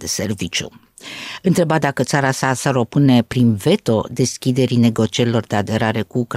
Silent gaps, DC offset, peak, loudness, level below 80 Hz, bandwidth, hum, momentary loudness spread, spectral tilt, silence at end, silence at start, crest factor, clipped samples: none; under 0.1%; -2 dBFS; -17 LUFS; -52 dBFS; 16 kHz; none; 8 LU; -5.5 dB/octave; 0 s; 0 s; 14 dB; under 0.1%